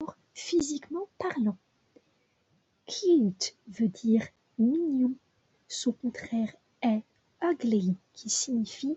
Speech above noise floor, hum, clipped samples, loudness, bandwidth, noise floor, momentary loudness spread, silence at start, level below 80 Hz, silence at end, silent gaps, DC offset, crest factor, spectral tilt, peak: 43 dB; none; under 0.1%; -30 LUFS; 8.4 kHz; -71 dBFS; 12 LU; 0 s; -70 dBFS; 0 s; none; under 0.1%; 16 dB; -4.5 dB/octave; -14 dBFS